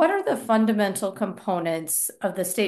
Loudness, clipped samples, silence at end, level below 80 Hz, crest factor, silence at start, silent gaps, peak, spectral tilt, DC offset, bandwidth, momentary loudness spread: -24 LUFS; under 0.1%; 0 s; -74 dBFS; 16 dB; 0 s; none; -8 dBFS; -4 dB/octave; under 0.1%; 13 kHz; 6 LU